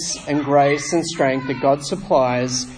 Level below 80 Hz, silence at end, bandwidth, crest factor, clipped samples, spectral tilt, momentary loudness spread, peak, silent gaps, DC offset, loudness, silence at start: -50 dBFS; 0 s; 10.5 kHz; 16 dB; under 0.1%; -4.5 dB/octave; 6 LU; -4 dBFS; none; under 0.1%; -19 LUFS; 0 s